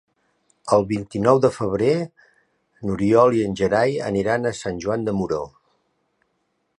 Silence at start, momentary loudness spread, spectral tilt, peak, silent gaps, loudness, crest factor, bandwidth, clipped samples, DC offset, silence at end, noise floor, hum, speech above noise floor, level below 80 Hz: 0.65 s; 12 LU; -6.5 dB/octave; -2 dBFS; none; -21 LUFS; 20 dB; 11 kHz; under 0.1%; under 0.1%; 1.3 s; -71 dBFS; none; 51 dB; -50 dBFS